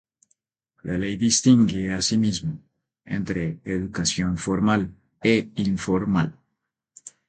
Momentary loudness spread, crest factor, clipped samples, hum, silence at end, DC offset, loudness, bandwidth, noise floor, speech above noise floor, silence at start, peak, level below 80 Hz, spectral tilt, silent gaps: 12 LU; 20 dB; under 0.1%; none; 0.2 s; under 0.1%; -23 LUFS; 9.4 kHz; -79 dBFS; 57 dB; 0.85 s; -4 dBFS; -48 dBFS; -4.5 dB/octave; none